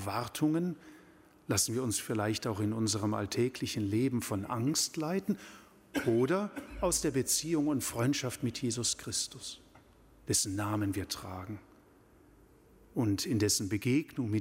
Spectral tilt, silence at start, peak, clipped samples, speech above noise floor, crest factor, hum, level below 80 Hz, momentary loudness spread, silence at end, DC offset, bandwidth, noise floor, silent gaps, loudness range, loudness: -4 dB/octave; 0 s; -14 dBFS; under 0.1%; 29 dB; 20 dB; none; -60 dBFS; 10 LU; 0 s; under 0.1%; 16 kHz; -61 dBFS; none; 4 LU; -32 LUFS